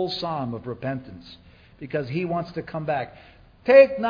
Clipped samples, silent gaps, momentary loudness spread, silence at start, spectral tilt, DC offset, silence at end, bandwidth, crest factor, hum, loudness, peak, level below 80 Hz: under 0.1%; none; 22 LU; 0 s; -7.5 dB/octave; under 0.1%; 0 s; 5.2 kHz; 22 dB; none; -23 LUFS; -2 dBFS; -56 dBFS